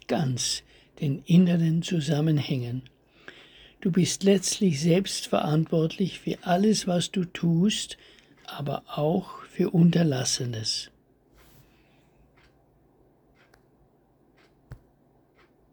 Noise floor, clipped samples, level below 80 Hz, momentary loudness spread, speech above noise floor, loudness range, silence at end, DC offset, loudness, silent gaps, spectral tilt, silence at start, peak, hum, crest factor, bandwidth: -63 dBFS; under 0.1%; -60 dBFS; 12 LU; 38 dB; 3 LU; 1 s; under 0.1%; -25 LUFS; none; -5.5 dB/octave; 0.1 s; -8 dBFS; none; 18 dB; 20 kHz